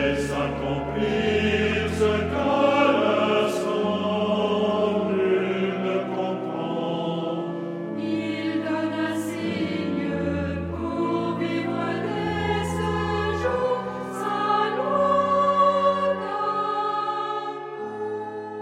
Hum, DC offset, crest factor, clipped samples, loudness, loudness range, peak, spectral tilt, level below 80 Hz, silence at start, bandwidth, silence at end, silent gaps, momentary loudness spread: none; under 0.1%; 18 dB; under 0.1%; -24 LUFS; 5 LU; -6 dBFS; -6 dB/octave; -48 dBFS; 0 s; 15 kHz; 0 s; none; 9 LU